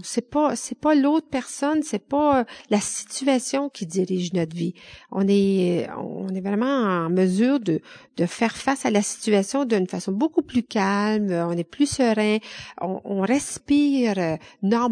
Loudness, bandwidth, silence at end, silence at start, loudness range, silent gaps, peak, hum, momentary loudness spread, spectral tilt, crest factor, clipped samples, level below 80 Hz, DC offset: -23 LUFS; 10 kHz; 0 s; 0 s; 2 LU; none; -8 dBFS; none; 8 LU; -5 dB/octave; 16 dB; under 0.1%; -58 dBFS; under 0.1%